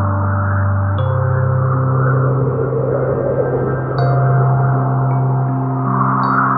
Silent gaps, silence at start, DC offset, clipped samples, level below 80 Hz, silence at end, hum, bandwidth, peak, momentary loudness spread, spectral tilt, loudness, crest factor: none; 0 s; 0.1%; under 0.1%; -42 dBFS; 0 s; none; 4.8 kHz; -2 dBFS; 3 LU; -12.5 dB/octave; -16 LUFS; 12 dB